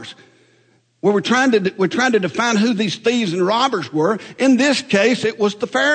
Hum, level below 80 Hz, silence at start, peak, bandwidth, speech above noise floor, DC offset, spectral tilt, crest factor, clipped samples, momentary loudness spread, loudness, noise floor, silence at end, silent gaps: none; -66 dBFS; 0 s; -4 dBFS; 9.4 kHz; 41 dB; under 0.1%; -4.5 dB/octave; 14 dB; under 0.1%; 5 LU; -17 LUFS; -58 dBFS; 0 s; none